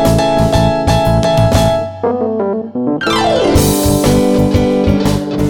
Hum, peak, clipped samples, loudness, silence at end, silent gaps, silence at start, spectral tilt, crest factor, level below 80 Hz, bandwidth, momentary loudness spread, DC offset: none; 0 dBFS; under 0.1%; -12 LUFS; 0 s; none; 0 s; -6 dB/octave; 12 dB; -24 dBFS; 19.5 kHz; 5 LU; under 0.1%